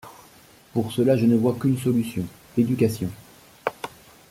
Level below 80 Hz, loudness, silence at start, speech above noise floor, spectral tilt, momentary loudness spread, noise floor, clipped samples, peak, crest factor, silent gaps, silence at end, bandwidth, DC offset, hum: -58 dBFS; -24 LUFS; 0.05 s; 30 dB; -7.5 dB/octave; 13 LU; -52 dBFS; under 0.1%; -6 dBFS; 18 dB; none; 0.4 s; 16 kHz; under 0.1%; none